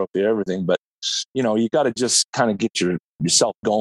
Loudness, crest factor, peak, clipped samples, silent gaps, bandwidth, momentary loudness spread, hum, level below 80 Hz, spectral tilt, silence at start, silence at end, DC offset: -20 LUFS; 18 dB; -2 dBFS; under 0.1%; 0.78-1.02 s, 1.25-1.34 s, 2.25-2.33 s, 3.04-3.19 s, 3.57-3.63 s; 12.5 kHz; 7 LU; none; -62 dBFS; -3 dB/octave; 0 s; 0 s; under 0.1%